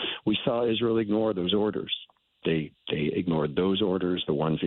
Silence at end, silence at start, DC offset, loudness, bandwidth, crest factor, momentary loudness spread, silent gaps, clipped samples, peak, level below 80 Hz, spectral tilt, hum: 0 s; 0 s; under 0.1%; -27 LUFS; 4.3 kHz; 14 dB; 6 LU; none; under 0.1%; -12 dBFS; -58 dBFS; -10 dB/octave; none